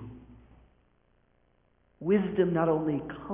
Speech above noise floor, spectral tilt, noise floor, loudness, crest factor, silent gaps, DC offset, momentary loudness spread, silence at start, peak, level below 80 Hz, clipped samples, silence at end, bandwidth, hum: 41 dB; -7.5 dB/octave; -68 dBFS; -28 LUFS; 18 dB; none; under 0.1%; 11 LU; 0 s; -12 dBFS; -60 dBFS; under 0.1%; 0 s; 3.7 kHz; none